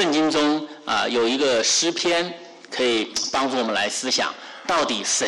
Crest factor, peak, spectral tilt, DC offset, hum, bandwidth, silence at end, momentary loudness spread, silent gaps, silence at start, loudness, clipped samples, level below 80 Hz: 10 dB; -12 dBFS; -1.5 dB/octave; under 0.1%; none; 13 kHz; 0 s; 8 LU; none; 0 s; -21 LUFS; under 0.1%; -62 dBFS